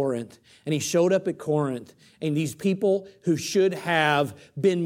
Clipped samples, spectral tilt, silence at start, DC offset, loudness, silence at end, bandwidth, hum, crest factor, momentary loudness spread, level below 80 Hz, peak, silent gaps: under 0.1%; -5 dB/octave; 0 s; under 0.1%; -25 LUFS; 0 s; 16.5 kHz; none; 18 dB; 10 LU; -70 dBFS; -6 dBFS; none